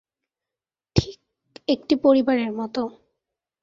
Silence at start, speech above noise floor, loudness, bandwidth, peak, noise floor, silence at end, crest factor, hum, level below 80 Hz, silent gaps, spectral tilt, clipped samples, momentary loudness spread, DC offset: 0.95 s; over 69 dB; -23 LUFS; 7.6 kHz; -2 dBFS; under -90 dBFS; 0.7 s; 22 dB; none; -44 dBFS; none; -6.5 dB/octave; under 0.1%; 15 LU; under 0.1%